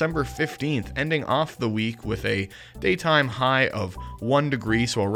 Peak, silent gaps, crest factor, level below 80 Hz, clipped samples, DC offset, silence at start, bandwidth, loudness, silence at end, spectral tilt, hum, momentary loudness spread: -6 dBFS; none; 18 dB; -44 dBFS; under 0.1%; under 0.1%; 0 s; 17.5 kHz; -24 LUFS; 0 s; -5.5 dB/octave; none; 8 LU